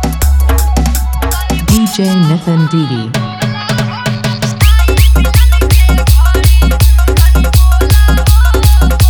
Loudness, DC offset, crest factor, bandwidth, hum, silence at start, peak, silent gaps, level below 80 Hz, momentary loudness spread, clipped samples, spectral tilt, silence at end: -10 LUFS; under 0.1%; 8 dB; over 20 kHz; none; 0 s; 0 dBFS; none; -10 dBFS; 7 LU; under 0.1%; -5.5 dB/octave; 0 s